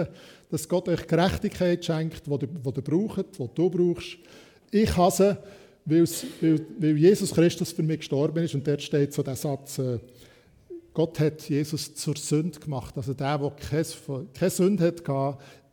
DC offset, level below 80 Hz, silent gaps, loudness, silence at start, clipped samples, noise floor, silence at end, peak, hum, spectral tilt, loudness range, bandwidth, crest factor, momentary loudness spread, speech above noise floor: under 0.1%; -50 dBFS; none; -26 LUFS; 0 s; under 0.1%; -46 dBFS; 0.2 s; -8 dBFS; none; -6 dB/octave; 6 LU; 19 kHz; 18 dB; 12 LU; 20 dB